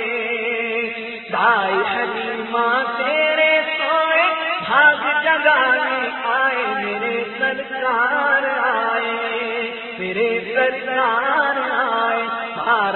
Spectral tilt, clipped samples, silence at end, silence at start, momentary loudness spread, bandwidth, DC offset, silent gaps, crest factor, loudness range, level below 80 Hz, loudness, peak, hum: -8 dB/octave; under 0.1%; 0 s; 0 s; 8 LU; 4.3 kHz; under 0.1%; none; 18 dB; 4 LU; -64 dBFS; -18 LUFS; -2 dBFS; none